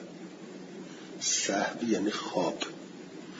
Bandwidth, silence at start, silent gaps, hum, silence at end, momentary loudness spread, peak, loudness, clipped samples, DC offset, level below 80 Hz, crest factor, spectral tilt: 7.8 kHz; 0 s; none; none; 0 s; 18 LU; -14 dBFS; -30 LUFS; under 0.1%; under 0.1%; -78 dBFS; 18 dB; -2.5 dB/octave